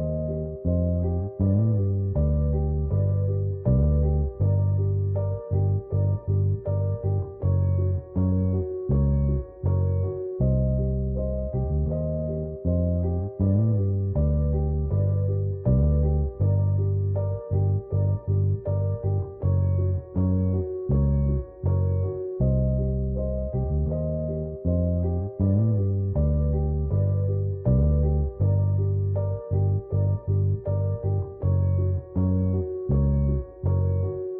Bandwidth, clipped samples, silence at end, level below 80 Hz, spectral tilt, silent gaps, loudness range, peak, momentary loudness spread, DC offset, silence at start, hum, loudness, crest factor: 1.8 kHz; under 0.1%; 0 s; -32 dBFS; -15.5 dB/octave; none; 2 LU; -12 dBFS; 5 LU; under 0.1%; 0 s; none; -25 LUFS; 12 dB